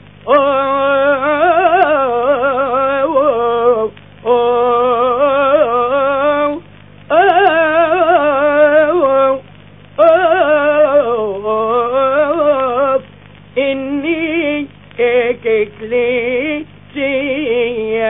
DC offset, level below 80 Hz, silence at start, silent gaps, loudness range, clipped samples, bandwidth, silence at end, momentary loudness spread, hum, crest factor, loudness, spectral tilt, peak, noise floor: 0.5%; -52 dBFS; 0.25 s; none; 4 LU; under 0.1%; 4 kHz; 0 s; 7 LU; 50 Hz at -40 dBFS; 12 dB; -13 LUFS; -8.5 dB/octave; 0 dBFS; -39 dBFS